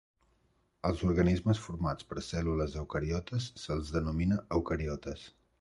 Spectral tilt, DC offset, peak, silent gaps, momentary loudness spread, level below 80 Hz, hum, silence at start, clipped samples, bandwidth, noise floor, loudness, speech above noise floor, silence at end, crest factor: -7 dB/octave; under 0.1%; -16 dBFS; none; 9 LU; -44 dBFS; none; 0.85 s; under 0.1%; 11.5 kHz; -73 dBFS; -33 LUFS; 40 dB; 0.3 s; 18 dB